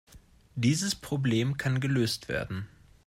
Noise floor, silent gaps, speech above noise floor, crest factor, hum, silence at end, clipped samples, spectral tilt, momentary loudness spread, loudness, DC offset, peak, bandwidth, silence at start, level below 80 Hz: -55 dBFS; none; 26 dB; 18 dB; none; 0.4 s; under 0.1%; -5 dB/octave; 12 LU; -29 LUFS; under 0.1%; -12 dBFS; 15.5 kHz; 0.15 s; -56 dBFS